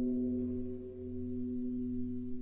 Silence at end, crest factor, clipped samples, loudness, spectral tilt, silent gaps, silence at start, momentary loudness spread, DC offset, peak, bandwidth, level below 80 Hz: 0 s; 10 dB; under 0.1%; -39 LUFS; -13 dB/octave; none; 0 s; 8 LU; under 0.1%; -26 dBFS; 1.3 kHz; -54 dBFS